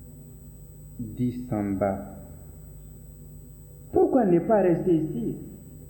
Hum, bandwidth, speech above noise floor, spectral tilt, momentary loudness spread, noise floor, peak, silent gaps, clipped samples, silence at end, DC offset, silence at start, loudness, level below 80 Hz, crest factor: none; 20 kHz; 21 dB; -9 dB/octave; 24 LU; -45 dBFS; -10 dBFS; none; under 0.1%; 0 s; under 0.1%; 0 s; -25 LUFS; -48 dBFS; 18 dB